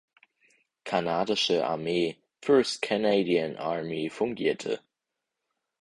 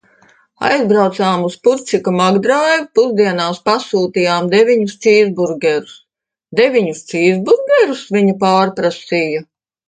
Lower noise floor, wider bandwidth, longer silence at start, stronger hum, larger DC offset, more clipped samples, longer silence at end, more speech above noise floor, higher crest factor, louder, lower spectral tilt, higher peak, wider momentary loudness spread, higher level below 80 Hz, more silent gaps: first, -86 dBFS vs -73 dBFS; first, 11.5 kHz vs 9.4 kHz; first, 0.85 s vs 0.6 s; neither; neither; neither; first, 1.05 s vs 0.45 s; about the same, 59 dB vs 59 dB; about the same, 18 dB vs 14 dB; second, -28 LUFS vs -14 LUFS; about the same, -4.5 dB/octave vs -5.5 dB/octave; second, -10 dBFS vs 0 dBFS; first, 9 LU vs 5 LU; second, -68 dBFS vs -62 dBFS; neither